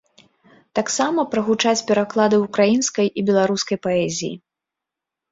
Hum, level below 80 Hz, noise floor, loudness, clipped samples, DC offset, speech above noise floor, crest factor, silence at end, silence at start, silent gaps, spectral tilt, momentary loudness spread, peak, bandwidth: none; -62 dBFS; -85 dBFS; -19 LUFS; under 0.1%; under 0.1%; 66 dB; 16 dB; 0.95 s; 0.75 s; none; -4 dB/octave; 8 LU; -4 dBFS; 8 kHz